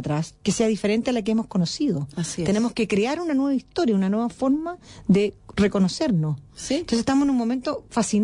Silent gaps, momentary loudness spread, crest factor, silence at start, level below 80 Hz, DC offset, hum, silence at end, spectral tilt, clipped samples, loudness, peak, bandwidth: none; 7 LU; 14 dB; 0 s; -50 dBFS; under 0.1%; none; 0 s; -5.5 dB/octave; under 0.1%; -23 LUFS; -8 dBFS; 11 kHz